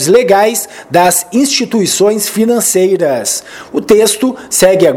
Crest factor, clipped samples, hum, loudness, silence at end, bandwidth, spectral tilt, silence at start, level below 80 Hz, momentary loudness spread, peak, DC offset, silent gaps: 10 dB; 0.4%; none; -10 LUFS; 0 s; 19.5 kHz; -3 dB/octave; 0 s; -48 dBFS; 7 LU; 0 dBFS; under 0.1%; none